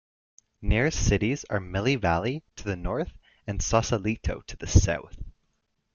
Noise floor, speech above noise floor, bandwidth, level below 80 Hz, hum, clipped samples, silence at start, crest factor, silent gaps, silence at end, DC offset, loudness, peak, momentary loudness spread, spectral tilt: -74 dBFS; 49 dB; 7.4 kHz; -36 dBFS; none; under 0.1%; 0.6 s; 22 dB; none; 0.65 s; under 0.1%; -27 LUFS; -4 dBFS; 13 LU; -5 dB/octave